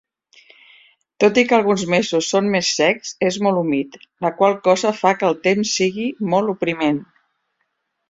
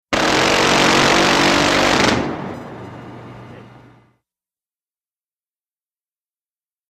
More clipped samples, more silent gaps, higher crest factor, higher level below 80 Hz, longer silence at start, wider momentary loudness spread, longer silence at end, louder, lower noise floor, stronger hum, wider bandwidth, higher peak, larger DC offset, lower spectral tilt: neither; neither; about the same, 18 dB vs 18 dB; second, -62 dBFS vs -44 dBFS; first, 1.2 s vs 0.1 s; second, 6 LU vs 22 LU; second, 1.05 s vs 3.3 s; second, -18 LUFS vs -14 LUFS; second, -72 dBFS vs under -90 dBFS; neither; second, 8 kHz vs 15 kHz; about the same, -2 dBFS vs 0 dBFS; neither; about the same, -4 dB/octave vs -3 dB/octave